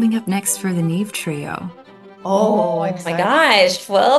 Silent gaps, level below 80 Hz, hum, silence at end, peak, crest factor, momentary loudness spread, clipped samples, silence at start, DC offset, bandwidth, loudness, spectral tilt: none; -64 dBFS; none; 0 s; -2 dBFS; 16 dB; 15 LU; under 0.1%; 0 s; under 0.1%; 12.5 kHz; -17 LUFS; -4 dB/octave